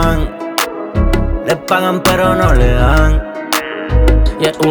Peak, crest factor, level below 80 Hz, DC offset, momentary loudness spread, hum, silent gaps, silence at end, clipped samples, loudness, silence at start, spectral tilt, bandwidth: 0 dBFS; 12 dB; -16 dBFS; under 0.1%; 6 LU; none; none; 0 s; under 0.1%; -14 LUFS; 0 s; -5.5 dB/octave; over 20 kHz